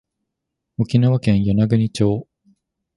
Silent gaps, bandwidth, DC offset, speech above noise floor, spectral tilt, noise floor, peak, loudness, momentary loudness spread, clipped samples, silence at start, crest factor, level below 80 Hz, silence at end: none; 11.5 kHz; under 0.1%; 63 dB; -8 dB/octave; -80 dBFS; -2 dBFS; -18 LUFS; 10 LU; under 0.1%; 0.8 s; 16 dB; -44 dBFS; 0.75 s